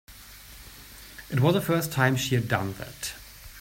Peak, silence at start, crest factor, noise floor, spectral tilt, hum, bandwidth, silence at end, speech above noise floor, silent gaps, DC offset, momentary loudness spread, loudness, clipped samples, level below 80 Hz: -8 dBFS; 0.1 s; 20 dB; -47 dBFS; -5 dB/octave; none; 16.5 kHz; 0 s; 21 dB; none; under 0.1%; 21 LU; -26 LUFS; under 0.1%; -52 dBFS